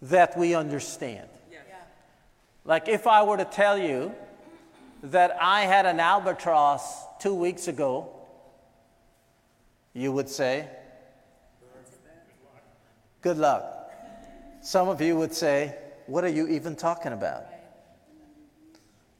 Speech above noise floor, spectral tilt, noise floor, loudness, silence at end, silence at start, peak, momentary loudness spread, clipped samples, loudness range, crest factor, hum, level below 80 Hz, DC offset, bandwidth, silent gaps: 40 dB; -4.5 dB/octave; -64 dBFS; -25 LUFS; 1.6 s; 0 s; -6 dBFS; 23 LU; under 0.1%; 11 LU; 22 dB; none; -66 dBFS; under 0.1%; 16.5 kHz; none